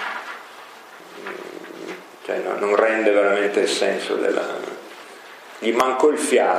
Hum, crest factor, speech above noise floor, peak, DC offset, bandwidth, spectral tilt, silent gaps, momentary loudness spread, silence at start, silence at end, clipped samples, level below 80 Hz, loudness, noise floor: none; 22 dB; 23 dB; 0 dBFS; under 0.1%; 15.5 kHz; -3 dB/octave; none; 22 LU; 0 s; 0 s; under 0.1%; -82 dBFS; -20 LUFS; -42 dBFS